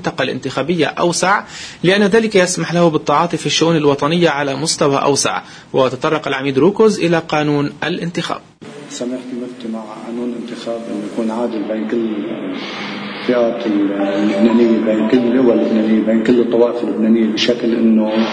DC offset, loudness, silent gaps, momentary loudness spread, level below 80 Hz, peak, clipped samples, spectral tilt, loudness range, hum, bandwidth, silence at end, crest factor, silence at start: under 0.1%; -16 LUFS; none; 12 LU; -56 dBFS; 0 dBFS; under 0.1%; -5 dB/octave; 9 LU; none; 10.5 kHz; 0 s; 16 dB; 0 s